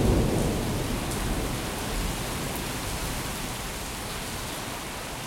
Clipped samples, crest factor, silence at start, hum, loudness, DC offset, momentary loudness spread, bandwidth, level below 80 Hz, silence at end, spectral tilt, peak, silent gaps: under 0.1%; 18 dB; 0 s; none; -30 LUFS; under 0.1%; 7 LU; 16.5 kHz; -36 dBFS; 0 s; -4.5 dB/octave; -12 dBFS; none